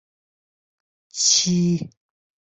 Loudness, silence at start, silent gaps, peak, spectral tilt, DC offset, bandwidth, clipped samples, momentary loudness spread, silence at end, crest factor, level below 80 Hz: -19 LUFS; 1.15 s; none; -6 dBFS; -3 dB/octave; under 0.1%; 8.4 kHz; under 0.1%; 19 LU; 0.65 s; 20 dB; -62 dBFS